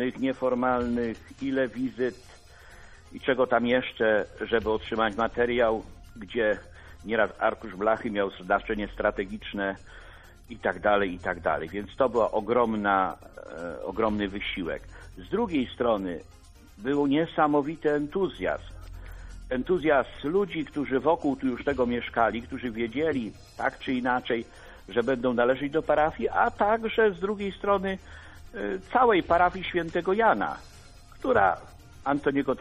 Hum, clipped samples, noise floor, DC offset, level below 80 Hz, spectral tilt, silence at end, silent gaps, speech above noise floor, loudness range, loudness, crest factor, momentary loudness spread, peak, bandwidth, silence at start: none; under 0.1%; -49 dBFS; under 0.1%; -50 dBFS; -6.5 dB/octave; 0 s; none; 22 dB; 4 LU; -27 LUFS; 20 dB; 12 LU; -8 dBFS; 12 kHz; 0 s